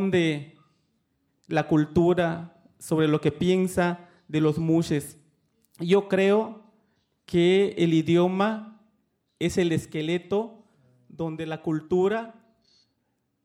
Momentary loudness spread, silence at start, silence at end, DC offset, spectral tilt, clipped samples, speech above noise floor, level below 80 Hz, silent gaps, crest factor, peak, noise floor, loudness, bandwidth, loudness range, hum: 13 LU; 0 s; 1.15 s; under 0.1%; -6.5 dB/octave; under 0.1%; 51 dB; -58 dBFS; none; 16 dB; -10 dBFS; -75 dBFS; -25 LUFS; 15.5 kHz; 6 LU; none